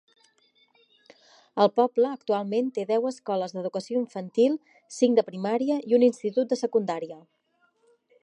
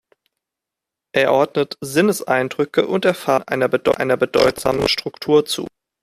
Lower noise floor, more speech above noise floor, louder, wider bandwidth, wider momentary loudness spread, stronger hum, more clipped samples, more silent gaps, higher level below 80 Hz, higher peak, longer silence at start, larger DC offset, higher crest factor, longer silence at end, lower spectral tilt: second, -68 dBFS vs -85 dBFS; second, 43 dB vs 67 dB; second, -26 LUFS vs -18 LUFS; second, 10.5 kHz vs 15 kHz; first, 10 LU vs 6 LU; neither; neither; neither; second, -82 dBFS vs -52 dBFS; second, -8 dBFS vs -2 dBFS; first, 1.55 s vs 1.15 s; neither; about the same, 20 dB vs 18 dB; first, 1.05 s vs 0.35 s; first, -6 dB/octave vs -4.5 dB/octave